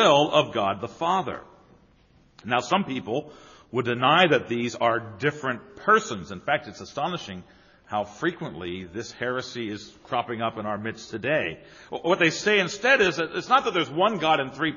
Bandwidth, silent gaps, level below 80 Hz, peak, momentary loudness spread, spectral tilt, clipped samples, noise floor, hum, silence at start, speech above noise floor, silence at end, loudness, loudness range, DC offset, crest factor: 7.2 kHz; none; -62 dBFS; -4 dBFS; 15 LU; -2.5 dB/octave; under 0.1%; -59 dBFS; none; 0 s; 34 dB; 0 s; -25 LUFS; 8 LU; under 0.1%; 22 dB